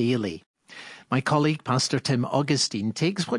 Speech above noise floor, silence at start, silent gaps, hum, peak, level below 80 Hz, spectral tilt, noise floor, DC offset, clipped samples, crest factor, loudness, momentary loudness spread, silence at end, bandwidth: 21 dB; 0 s; 0.46-0.54 s; none; -8 dBFS; -66 dBFS; -5 dB/octave; -45 dBFS; under 0.1%; under 0.1%; 16 dB; -25 LUFS; 19 LU; 0 s; 11.5 kHz